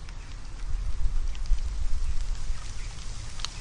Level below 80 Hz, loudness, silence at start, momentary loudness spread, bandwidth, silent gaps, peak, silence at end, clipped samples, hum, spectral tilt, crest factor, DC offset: -30 dBFS; -36 LUFS; 0 s; 8 LU; 10 kHz; none; -10 dBFS; 0 s; under 0.1%; none; -3.5 dB/octave; 16 dB; under 0.1%